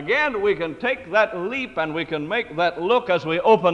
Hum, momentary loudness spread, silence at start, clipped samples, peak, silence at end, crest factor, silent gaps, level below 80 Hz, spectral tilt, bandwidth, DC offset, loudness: none; 6 LU; 0 s; under 0.1%; -4 dBFS; 0 s; 16 dB; none; -56 dBFS; -6 dB/octave; 8.6 kHz; under 0.1%; -22 LUFS